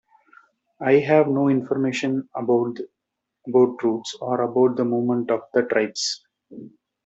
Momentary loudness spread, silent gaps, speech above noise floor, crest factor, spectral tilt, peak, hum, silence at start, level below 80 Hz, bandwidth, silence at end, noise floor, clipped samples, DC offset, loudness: 16 LU; none; 54 dB; 18 dB; -5.5 dB/octave; -4 dBFS; none; 0.8 s; -70 dBFS; 8 kHz; 0.35 s; -75 dBFS; under 0.1%; under 0.1%; -22 LUFS